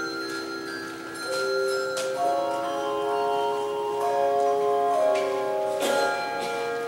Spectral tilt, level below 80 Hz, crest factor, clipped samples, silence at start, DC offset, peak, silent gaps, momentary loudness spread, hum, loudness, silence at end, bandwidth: -3 dB/octave; -68 dBFS; 14 dB; under 0.1%; 0 s; under 0.1%; -12 dBFS; none; 9 LU; none; -26 LUFS; 0 s; 16 kHz